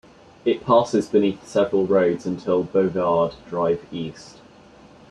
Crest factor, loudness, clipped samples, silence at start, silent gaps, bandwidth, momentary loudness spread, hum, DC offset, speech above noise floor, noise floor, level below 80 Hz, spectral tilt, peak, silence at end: 18 dB; -21 LUFS; under 0.1%; 0.45 s; none; 10.5 kHz; 9 LU; none; under 0.1%; 27 dB; -48 dBFS; -58 dBFS; -6.5 dB/octave; -4 dBFS; 0.8 s